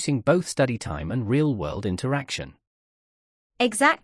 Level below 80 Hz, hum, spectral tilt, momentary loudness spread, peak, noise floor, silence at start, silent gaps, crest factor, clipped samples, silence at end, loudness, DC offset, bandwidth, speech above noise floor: -50 dBFS; none; -5 dB/octave; 10 LU; -6 dBFS; under -90 dBFS; 0 s; 2.67-3.50 s; 18 dB; under 0.1%; 0.1 s; -25 LUFS; under 0.1%; 12 kHz; over 66 dB